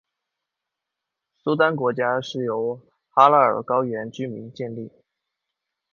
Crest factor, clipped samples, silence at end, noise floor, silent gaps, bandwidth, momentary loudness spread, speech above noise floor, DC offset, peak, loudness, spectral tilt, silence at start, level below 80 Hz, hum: 24 dB; under 0.1%; 1.05 s; -84 dBFS; none; 7.2 kHz; 17 LU; 63 dB; under 0.1%; 0 dBFS; -21 LUFS; -6.5 dB/octave; 1.45 s; -72 dBFS; none